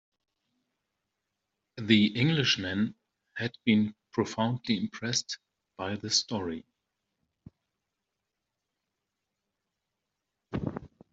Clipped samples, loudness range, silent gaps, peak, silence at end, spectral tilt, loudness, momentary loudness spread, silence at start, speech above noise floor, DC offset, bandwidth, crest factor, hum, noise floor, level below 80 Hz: under 0.1%; 17 LU; none; -8 dBFS; 0.25 s; -4 dB/octave; -29 LUFS; 16 LU; 1.75 s; 57 dB; under 0.1%; 8 kHz; 26 dB; none; -85 dBFS; -64 dBFS